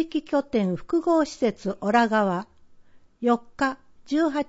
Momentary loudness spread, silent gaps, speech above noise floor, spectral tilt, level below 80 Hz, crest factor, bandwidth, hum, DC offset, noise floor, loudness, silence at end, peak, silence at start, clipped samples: 7 LU; none; 27 dB; -6 dB/octave; -58 dBFS; 16 dB; 8 kHz; none; under 0.1%; -51 dBFS; -24 LUFS; 0.05 s; -8 dBFS; 0 s; under 0.1%